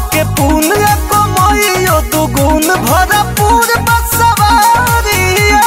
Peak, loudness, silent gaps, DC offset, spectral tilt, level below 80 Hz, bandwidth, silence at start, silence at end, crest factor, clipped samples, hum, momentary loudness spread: 0 dBFS; -9 LUFS; none; under 0.1%; -4 dB/octave; -20 dBFS; 16.5 kHz; 0 s; 0 s; 10 dB; under 0.1%; none; 3 LU